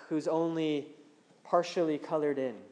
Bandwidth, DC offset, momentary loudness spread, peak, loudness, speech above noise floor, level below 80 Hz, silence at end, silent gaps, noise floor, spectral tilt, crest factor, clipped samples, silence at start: 10 kHz; under 0.1%; 5 LU; -14 dBFS; -32 LUFS; 26 dB; under -90 dBFS; 0.05 s; none; -58 dBFS; -6 dB/octave; 18 dB; under 0.1%; 0 s